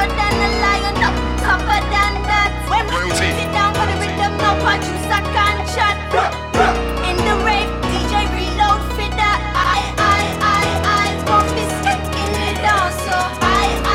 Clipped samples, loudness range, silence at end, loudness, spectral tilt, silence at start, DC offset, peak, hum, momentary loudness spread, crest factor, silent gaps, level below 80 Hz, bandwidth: under 0.1%; 1 LU; 0 s; -16 LUFS; -4 dB/octave; 0 s; under 0.1%; -2 dBFS; none; 4 LU; 16 dB; none; -26 dBFS; 16.5 kHz